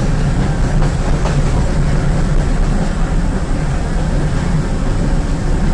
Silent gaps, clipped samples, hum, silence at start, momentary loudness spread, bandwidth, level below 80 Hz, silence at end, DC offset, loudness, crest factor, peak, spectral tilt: none; under 0.1%; none; 0 s; 3 LU; 10.5 kHz; -16 dBFS; 0 s; under 0.1%; -17 LUFS; 10 dB; -4 dBFS; -6.5 dB/octave